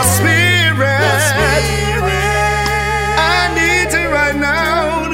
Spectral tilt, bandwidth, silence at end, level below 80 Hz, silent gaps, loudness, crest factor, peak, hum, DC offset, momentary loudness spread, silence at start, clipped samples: -3.5 dB/octave; 16.5 kHz; 0 s; -26 dBFS; none; -13 LUFS; 14 dB; 0 dBFS; none; under 0.1%; 4 LU; 0 s; under 0.1%